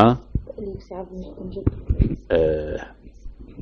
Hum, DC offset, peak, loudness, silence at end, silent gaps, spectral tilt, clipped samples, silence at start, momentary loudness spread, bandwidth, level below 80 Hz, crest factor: none; under 0.1%; 0 dBFS; -25 LUFS; 0 s; none; -9.5 dB/octave; under 0.1%; 0 s; 20 LU; 6.6 kHz; -32 dBFS; 24 dB